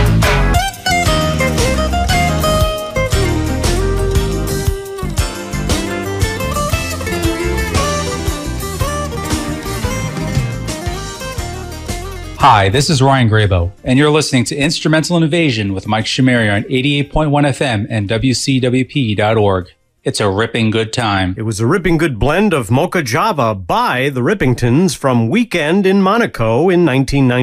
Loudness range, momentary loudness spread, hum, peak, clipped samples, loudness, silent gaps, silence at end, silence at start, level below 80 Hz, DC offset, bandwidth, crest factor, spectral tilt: 5 LU; 9 LU; none; 0 dBFS; under 0.1%; -15 LUFS; none; 0 s; 0 s; -24 dBFS; under 0.1%; 15.5 kHz; 14 dB; -5 dB/octave